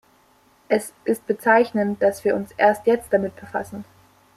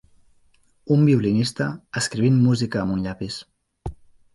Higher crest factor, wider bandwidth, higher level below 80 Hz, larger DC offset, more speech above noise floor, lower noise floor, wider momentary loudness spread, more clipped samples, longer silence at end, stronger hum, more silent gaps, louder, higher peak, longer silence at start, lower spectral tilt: about the same, 18 dB vs 16 dB; first, 15.5 kHz vs 11.5 kHz; second, -60 dBFS vs -48 dBFS; neither; about the same, 37 dB vs 39 dB; about the same, -58 dBFS vs -59 dBFS; second, 12 LU vs 20 LU; neither; first, 0.55 s vs 0.4 s; neither; neither; about the same, -21 LUFS vs -21 LUFS; first, -4 dBFS vs -8 dBFS; second, 0.7 s vs 0.85 s; about the same, -5.5 dB/octave vs -6 dB/octave